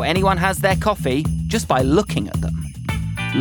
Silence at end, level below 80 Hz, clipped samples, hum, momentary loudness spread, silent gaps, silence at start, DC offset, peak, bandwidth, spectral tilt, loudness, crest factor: 0 s; -32 dBFS; under 0.1%; none; 9 LU; none; 0 s; under 0.1%; -2 dBFS; over 20 kHz; -5.5 dB/octave; -20 LUFS; 18 dB